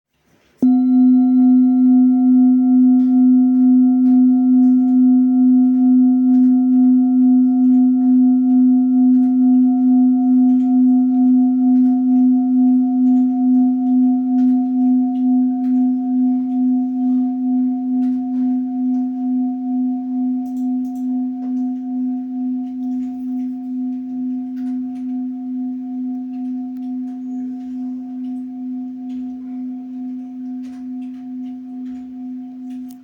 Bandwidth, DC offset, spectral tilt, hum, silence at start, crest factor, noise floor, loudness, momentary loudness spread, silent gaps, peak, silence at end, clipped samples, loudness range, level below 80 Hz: 1.4 kHz; under 0.1%; -9.5 dB/octave; none; 0.6 s; 8 dB; -58 dBFS; -15 LUFS; 15 LU; none; -6 dBFS; 0.05 s; under 0.1%; 15 LU; -68 dBFS